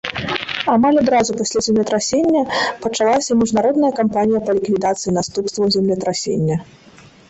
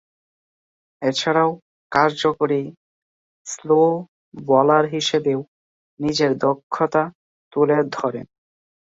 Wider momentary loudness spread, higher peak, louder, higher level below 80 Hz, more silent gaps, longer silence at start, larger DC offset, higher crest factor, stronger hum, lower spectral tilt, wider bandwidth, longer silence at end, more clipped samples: second, 6 LU vs 16 LU; about the same, -2 dBFS vs 0 dBFS; first, -17 LUFS vs -20 LUFS; first, -50 dBFS vs -64 dBFS; second, none vs 1.62-1.90 s, 2.77-3.45 s, 4.08-4.32 s, 5.48-5.97 s, 6.63-6.70 s, 7.15-7.51 s; second, 0.05 s vs 1 s; neither; about the same, 16 dB vs 20 dB; neither; about the same, -4.5 dB/octave vs -5 dB/octave; about the same, 8.4 kHz vs 8 kHz; about the same, 0.65 s vs 0.55 s; neither